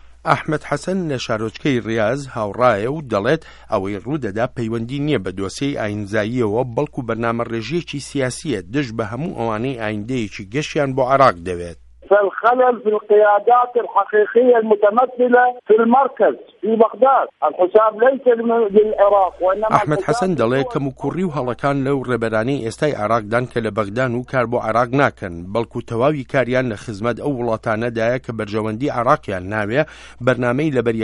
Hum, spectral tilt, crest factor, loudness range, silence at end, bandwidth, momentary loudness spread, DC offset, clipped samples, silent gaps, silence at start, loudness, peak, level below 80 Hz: none; -6.5 dB/octave; 18 dB; 7 LU; 0 s; 11.5 kHz; 10 LU; under 0.1%; under 0.1%; none; 0.05 s; -18 LUFS; 0 dBFS; -48 dBFS